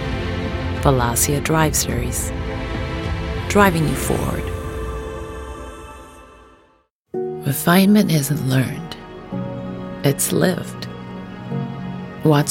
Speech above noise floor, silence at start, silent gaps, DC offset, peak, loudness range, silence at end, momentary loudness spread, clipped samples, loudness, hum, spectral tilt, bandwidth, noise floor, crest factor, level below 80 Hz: 42 dB; 0 s; 6.90-7.05 s; under 0.1%; -2 dBFS; 7 LU; 0 s; 17 LU; under 0.1%; -20 LUFS; none; -5 dB/octave; 17 kHz; -59 dBFS; 18 dB; -34 dBFS